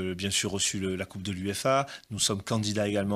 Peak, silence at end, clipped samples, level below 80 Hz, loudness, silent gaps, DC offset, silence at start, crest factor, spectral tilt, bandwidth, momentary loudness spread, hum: -12 dBFS; 0 s; under 0.1%; -62 dBFS; -29 LUFS; none; under 0.1%; 0 s; 18 dB; -3.5 dB/octave; 15.5 kHz; 7 LU; none